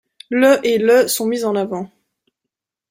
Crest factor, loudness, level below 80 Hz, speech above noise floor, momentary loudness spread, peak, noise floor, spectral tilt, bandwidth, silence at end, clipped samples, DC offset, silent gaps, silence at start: 16 dB; -16 LUFS; -64 dBFS; 67 dB; 12 LU; -2 dBFS; -82 dBFS; -4 dB/octave; 16.5 kHz; 1.05 s; under 0.1%; under 0.1%; none; 0.3 s